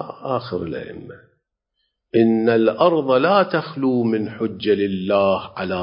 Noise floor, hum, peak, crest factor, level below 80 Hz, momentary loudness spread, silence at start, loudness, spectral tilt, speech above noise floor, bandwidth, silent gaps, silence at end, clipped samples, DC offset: -74 dBFS; none; -2 dBFS; 18 dB; -54 dBFS; 11 LU; 0 s; -19 LUFS; -11.5 dB/octave; 55 dB; 5.4 kHz; none; 0 s; under 0.1%; under 0.1%